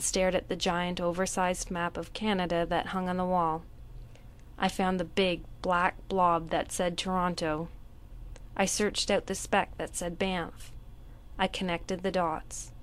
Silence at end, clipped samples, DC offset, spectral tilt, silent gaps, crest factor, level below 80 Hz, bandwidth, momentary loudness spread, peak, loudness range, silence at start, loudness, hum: 0 s; under 0.1%; under 0.1%; -4 dB/octave; none; 20 dB; -48 dBFS; 15 kHz; 13 LU; -10 dBFS; 3 LU; 0 s; -30 LUFS; none